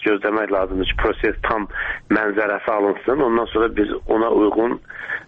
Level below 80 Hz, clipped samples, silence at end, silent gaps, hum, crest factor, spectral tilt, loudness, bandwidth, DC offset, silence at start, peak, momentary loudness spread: -36 dBFS; under 0.1%; 0.05 s; none; none; 18 dB; -8 dB/octave; -20 LUFS; 4.9 kHz; under 0.1%; 0 s; -2 dBFS; 5 LU